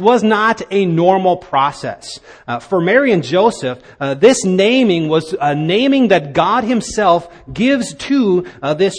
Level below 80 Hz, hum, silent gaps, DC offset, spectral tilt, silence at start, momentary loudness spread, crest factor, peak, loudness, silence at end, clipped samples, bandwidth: -48 dBFS; none; none; under 0.1%; -5 dB/octave; 0 s; 12 LU; 14 dB; 0 dBFS; -14 LUFS; 0 s; under 0.1%; 10 kHz